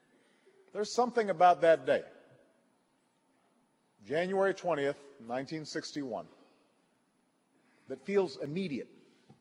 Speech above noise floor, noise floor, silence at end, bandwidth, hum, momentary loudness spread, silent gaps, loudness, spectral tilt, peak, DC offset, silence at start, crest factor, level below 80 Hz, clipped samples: 42 dB; -74 dBFS; 0.55 s; 11.5 kHz; none; 17 LU; none; -32 LUFS; -5 dB/octave; -12 dBFS; under 0.1%; 0.75 s; 22 dB; -84 dBFS; under 0.1%